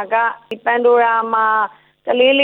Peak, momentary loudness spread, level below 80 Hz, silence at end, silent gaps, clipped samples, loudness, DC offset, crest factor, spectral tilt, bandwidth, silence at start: -2 dBFS; 10 LU; -68 dBFS; 0 s; none; under 0.1%; -16 LUFS; under 0.1%; 14 dB; -5.5 dB/octave; 4.1 kHz; 0 s